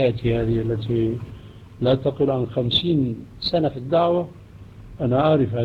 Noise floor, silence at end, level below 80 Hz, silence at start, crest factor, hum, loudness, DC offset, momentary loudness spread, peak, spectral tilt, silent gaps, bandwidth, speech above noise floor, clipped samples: -42 dBFS; 0 s; -42 dBFS; 0 s; 14 dB; none; -22 LUFS; under 0.1%; 8 LU; -6 dBFS; -8.5 dB/octave; none; 6 kHz; 21 dB; under 0.1%